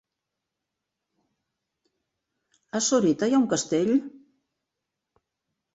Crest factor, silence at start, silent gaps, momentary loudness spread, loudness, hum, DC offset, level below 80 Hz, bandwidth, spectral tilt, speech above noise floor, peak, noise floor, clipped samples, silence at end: 18 dB; 2.75 s; none; 8 LU; -24 LUFS; none; under 0.1%; -70 dBFS; 8 kHz; -4 dB/octave; 62 dB; -12 dBFS; -85 dBFS; under 0.1%; 1.65 s